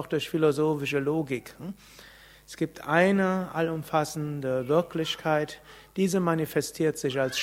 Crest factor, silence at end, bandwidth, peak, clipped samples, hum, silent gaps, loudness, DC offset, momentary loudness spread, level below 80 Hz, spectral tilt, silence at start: 22 dB; 0 s; 16 kHz; -6 dBFS; under 0.1%; none; none; -27 LUFS; under 0.1%; 14 LU; -62 dBFS; -5.5 dB/octave; 0 s